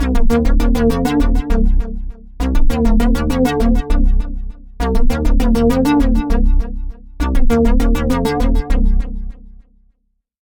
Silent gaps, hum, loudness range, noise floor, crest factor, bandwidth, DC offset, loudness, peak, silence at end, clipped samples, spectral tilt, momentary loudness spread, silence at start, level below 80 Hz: none; none; 2 LU; -65 dBFS; 12 dB; 15 kHz; under 0.1%; -17 LUFS; -2 dBFS; 1.1 s; under 0.1%; -7 dB/octave; 13 LU; 0 s; -14 dBFS